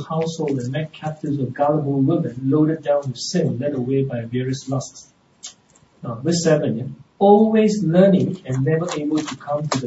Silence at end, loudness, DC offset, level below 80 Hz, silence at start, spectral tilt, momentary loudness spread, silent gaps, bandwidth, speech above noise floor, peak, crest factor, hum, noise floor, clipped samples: 0 s; -20 LUFS; under 0.1%; -58 dBFS; 0 s; -6.5 dB/octave; 14 LU; none; 8 kHz; 35 dB; 0 dBFS; 20 dB; none; -54 dBFS; under 0.1%